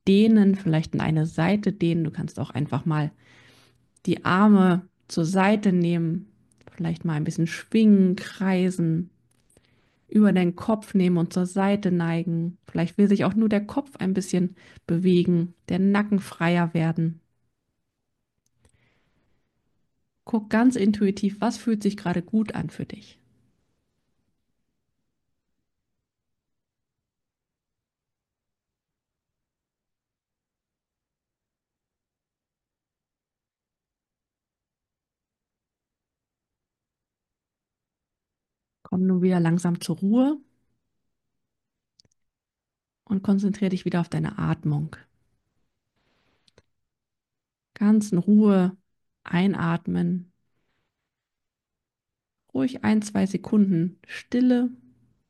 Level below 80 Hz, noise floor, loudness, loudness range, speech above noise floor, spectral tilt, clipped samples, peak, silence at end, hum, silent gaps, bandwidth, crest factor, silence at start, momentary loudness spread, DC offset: -62 dBFS; under -90 dBFS; -23 LUFS; 9 LU; over 68 dB; -7.5 dB/octave; under 0.1%; -8 dBFS; 0.55 s; none; none; 12 kHz; 18 dB; 0.05 s; 11 LU; under 0.1%